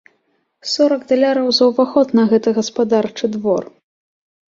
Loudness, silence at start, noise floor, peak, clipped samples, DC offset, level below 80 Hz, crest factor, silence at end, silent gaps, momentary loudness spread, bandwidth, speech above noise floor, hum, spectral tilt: -16 LUFS; 0.65 s; -65 dBFS; -2 dBFS; under 0.1%; under 0.1%; -62 dBFS; 14 dB; 0.85 s; none; 7 LU; 7.6 kHz; 50 dB; none; -5 dB/octave